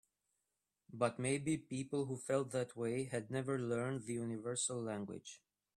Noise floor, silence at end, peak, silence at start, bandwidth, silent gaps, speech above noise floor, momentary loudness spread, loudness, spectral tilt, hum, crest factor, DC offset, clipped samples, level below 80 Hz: -89 dBFS; 0.4 s; -22 dBFS; 0.9 s; 13 kHz; none; 49 dB; 8 LU; -40 LUFS; -5 dB/octave; none; 20 dB; under 0.1%; under 0.1%; -76 dBFS